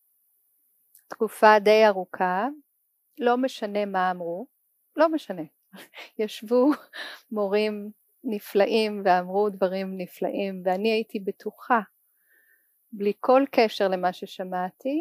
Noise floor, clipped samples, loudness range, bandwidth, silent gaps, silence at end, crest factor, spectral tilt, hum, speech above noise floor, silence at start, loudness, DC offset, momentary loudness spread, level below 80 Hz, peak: -71 dBFS; under 0.1%; 5 LU; 15.5 kHz; none; 0 s; 22 dB; -5.5 dB/octave; none; 47 dB; 1.1 s; -24 LUFS; under 0.1%; 18 LU; -88 dBFS; -4 dBFS